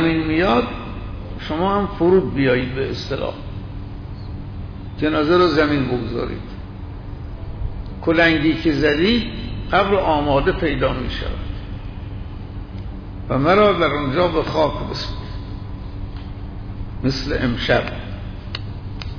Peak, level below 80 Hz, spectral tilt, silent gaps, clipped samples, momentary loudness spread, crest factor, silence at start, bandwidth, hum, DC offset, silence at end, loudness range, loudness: -4 dBFS; -32 dBFS; -7 dB/octave; none; under 0.1%; 17 LU; 16 dB; 0 s; 5.4 kHz; none; under 0.1%; 0 s; 6 LU; -19 LUFS